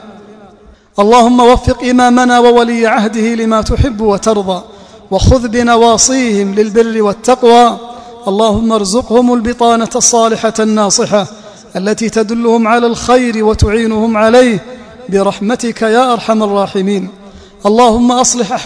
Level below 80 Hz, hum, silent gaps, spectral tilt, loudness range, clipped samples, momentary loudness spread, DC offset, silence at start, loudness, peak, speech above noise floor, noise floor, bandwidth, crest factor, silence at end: -28 dBFS; none; none; -4.5 dB/octave; 3 LU; 2%; 9 LU; under 0.1%; 0 s; -10 LUFS; 0 dBFS; 31 dB; -40 dBFS; 11 kHz; 10 dB; 0 s